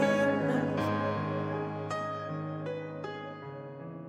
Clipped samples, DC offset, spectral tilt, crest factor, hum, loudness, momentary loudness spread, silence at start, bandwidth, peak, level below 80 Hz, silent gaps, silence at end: under 0.1%; under 0.1%; -7 dB/octave; 16 dB; none; -33 LUFS; 15 LU; 0 s; 14 kHz; -16 dBFS; -70 dBFS; none; 0 s